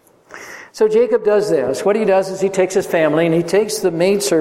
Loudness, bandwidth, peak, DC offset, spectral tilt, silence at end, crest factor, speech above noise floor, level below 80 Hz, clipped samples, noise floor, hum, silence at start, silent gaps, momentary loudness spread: -16 LUFS; 16.5 kHz; -2 dBFS; under 0.1%; -5 dB/octave; 0 s; 14 dB; 23 dB; -58 dBFS; under 0.1%; -38 dBFS; none; 0.35 s; none; 6 LU